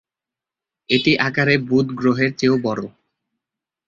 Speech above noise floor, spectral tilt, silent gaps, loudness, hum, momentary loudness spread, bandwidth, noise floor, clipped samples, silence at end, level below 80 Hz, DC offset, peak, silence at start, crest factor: 70 dB; -6 dB/octave; none; -18 LUFS; none; 8 LU; 7.2 kHz; -88 dBFS; under 0.1%; 1 s; -56 dBFS; under 0.1%; -2 dBFS; 0.9 s; 18 dB